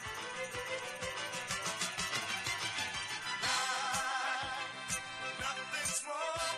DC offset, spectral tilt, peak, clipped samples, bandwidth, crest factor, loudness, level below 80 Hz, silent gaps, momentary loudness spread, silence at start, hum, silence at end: under 0.1%; -0.5 dB/octave; -22 dBFS; under 0.1%; 13 kHz; 16 dB; -36 LUFS; -64 dBFS; none; 6 LU; 0 s; none; 0 s